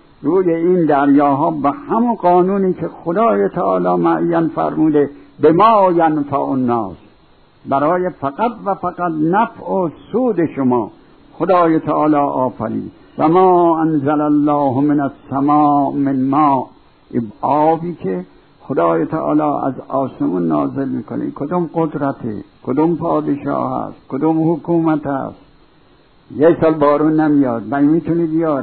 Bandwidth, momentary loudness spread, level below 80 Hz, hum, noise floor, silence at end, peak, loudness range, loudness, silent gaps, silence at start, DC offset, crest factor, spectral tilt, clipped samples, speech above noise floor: 4.5 kHz; 10 LU; -52 dBFS; none; -50 dBFS; 0 s; 0 dBFS; 5 LU; -16 LUFS; none; 0.2 s; 0.2%; 14 dB; -12 dB/octave; under 0.1%; 35 dB